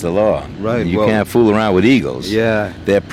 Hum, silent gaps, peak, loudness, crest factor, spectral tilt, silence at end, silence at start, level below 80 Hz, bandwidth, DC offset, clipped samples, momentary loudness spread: none; none; -2 dBFS; -15 LUFS; 12 dB; -6.5 dB/octave; 0 s; 0 s; -40 dBFS; 15.5 kHz; under 0.1%; under 0.1%; 6 LU